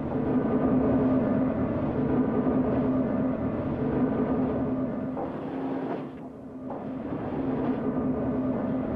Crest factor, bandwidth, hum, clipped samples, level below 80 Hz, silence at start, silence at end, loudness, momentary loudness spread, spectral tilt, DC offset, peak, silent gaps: 14 dB; 4 kHz; none; under 0.1%; -46 dBFS; 0 s; 0 s; -28 LUFS; 10 LU; -11 dB/octave; under 0.1%; -14 dBFS; none